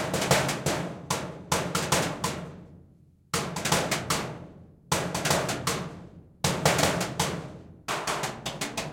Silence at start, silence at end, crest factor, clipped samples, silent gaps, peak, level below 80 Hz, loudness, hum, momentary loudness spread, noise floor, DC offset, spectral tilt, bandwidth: 0 s; 0 s; 22 dB; under 0.1%; none; -8 dBFS; -54 dBFS; -28 LUFS; none; 14 LU; -57 dBFS; under 0.1%; -3.5 dB/octave; 17 kHz